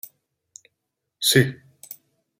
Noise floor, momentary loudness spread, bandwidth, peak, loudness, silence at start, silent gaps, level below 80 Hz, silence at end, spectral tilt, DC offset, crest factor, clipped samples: -80 dBFS; 25 LU; 16.5 kHz; -2 dBFS; -20 LUFS; 1.2 s; none; -60 dBFS; 0.45 s; -3.5 dB/octave; under 0.1%; 24 dB; under 0.1%